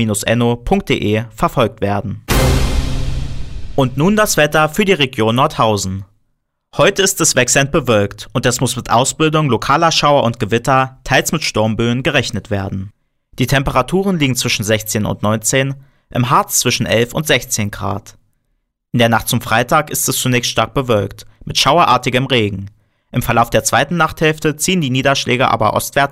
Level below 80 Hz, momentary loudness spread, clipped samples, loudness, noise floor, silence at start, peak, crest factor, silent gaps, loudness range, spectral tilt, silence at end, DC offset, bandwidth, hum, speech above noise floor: -30 dBFS; 10 LU; under 0.1%; -15 LUFS; -67 dBFS; 0 s; -2 dBFS; 14 dB; none; 3 LU; -4 dB/octave; 0 s; 0.2%; 16 kHz; none; 52 dB